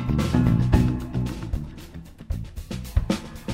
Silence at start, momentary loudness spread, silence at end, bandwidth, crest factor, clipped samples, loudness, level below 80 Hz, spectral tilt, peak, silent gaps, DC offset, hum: 0 s; 18 LU; 0 s; 16 kHz; 18 dB; under 0.1%; -25 LUFS; -30 dBFS; -7.5 dB/octave; -6 dBFS; none; under 0.1%; none